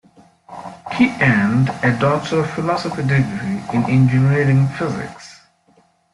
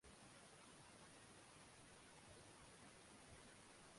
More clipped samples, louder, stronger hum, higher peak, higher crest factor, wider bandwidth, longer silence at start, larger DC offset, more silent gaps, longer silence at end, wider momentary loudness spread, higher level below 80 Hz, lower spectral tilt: neither; first, -17 LUFS vs -64 LUFS; neither; first, -4 dBFS vs -50 dBFS; about the same, 14 dB vs 14 dB; about the same, 11 kHz vs 11.5 kHz; first, 0.5 s vs 0 s; neither; neither; first, 0.8 s vs 0 s; first, 18 LU vs 1 LU; first, -52 dBFS vs -78 dBFS; first, -7.5 dB/octave vs -3 dB/octave